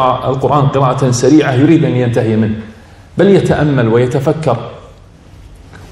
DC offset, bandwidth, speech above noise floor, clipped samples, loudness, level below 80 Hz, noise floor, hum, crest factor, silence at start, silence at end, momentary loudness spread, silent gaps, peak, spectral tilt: under 0.1%; 12 kHz; 27 dB; 0.4%; -11 LUFS; -40 dBFS; -38 dBFS; none; 12 dB; 0 s; 0 s; 8 LU; none; 0 dBFS; -7 dB/octave